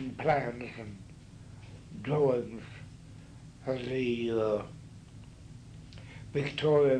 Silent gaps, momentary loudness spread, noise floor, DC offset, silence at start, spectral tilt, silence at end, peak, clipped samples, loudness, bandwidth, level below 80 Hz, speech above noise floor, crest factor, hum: none; 22 LU; -50 dBFS; under 0.1%; 0 s; -7 dB/octave; 0 s; -14 dBFS; under 0.1%; -32 LUFS; 10 kHz; -58 dBFS; 20 dB; 18 dB; none